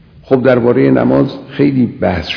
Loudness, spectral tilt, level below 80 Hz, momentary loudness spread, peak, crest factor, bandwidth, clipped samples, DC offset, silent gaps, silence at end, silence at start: -12 LUFS; -8.5 dB/octave; -40 dBFS; 6 LU; 0 dBFS; 12 dB; 5.4 kHz; 0.5%; under 0.1%; none; 0 s; 0.3 s